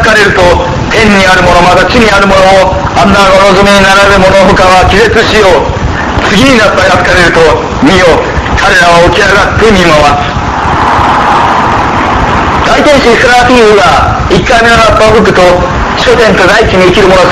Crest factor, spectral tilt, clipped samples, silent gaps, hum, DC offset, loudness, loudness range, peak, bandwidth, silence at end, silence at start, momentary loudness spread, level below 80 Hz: 4 dB; -4.5 dB/octave; 7%; none; none; under 0.1%; -4 LUFS; 2 LU; 0 dBFS; 16 kHz; 0 s; 0 s; 5 LU; -18 dBFS